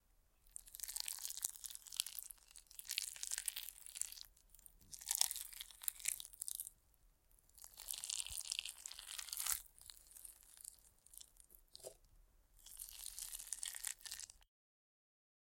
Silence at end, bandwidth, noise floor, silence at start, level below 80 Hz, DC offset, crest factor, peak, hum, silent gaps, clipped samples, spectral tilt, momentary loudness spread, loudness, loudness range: 1 s; 17 kHz; -73 dBFS; 0.2 s; -72 dBFS; under 0.1%; 38 dB; -12 dBFS; none; none; under 0.1%; 2.5 dB/octave; 18 LU; -44 LUFS; 8 LU